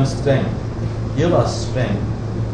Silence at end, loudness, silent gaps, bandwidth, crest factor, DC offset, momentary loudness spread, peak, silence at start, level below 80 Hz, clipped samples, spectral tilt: 0 s; -20 LUFS; none; 10 kHz; 16 dB; under 0.1%; 7 LU; -4 dBFS; 0 s; -32 dBFS; under 0.1%; -7 dB/octave